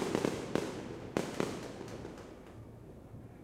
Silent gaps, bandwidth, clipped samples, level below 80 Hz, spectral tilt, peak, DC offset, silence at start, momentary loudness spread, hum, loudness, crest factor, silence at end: none; 16 kHz; under 0.1%; -60 dBFS; -5.5 dB/octave; -14 dBFS; under 0.1%; 0 s; 17 LU; none; -39 LUFS; 24 dB; 0 s